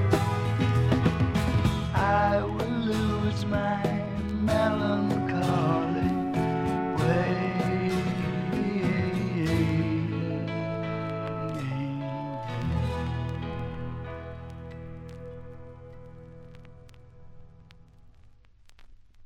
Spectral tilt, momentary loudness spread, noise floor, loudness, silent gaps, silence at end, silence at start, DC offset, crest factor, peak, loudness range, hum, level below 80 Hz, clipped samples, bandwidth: -7.5 dB/octave; 17 LU; -54 dBFS; -28 LUFS; none; 0.05 s; 0 s; under 0.1%; 18 dB; -10 dBFS; 16 LU; none; -44 dBFS; under 0.1%; 14.5 kHz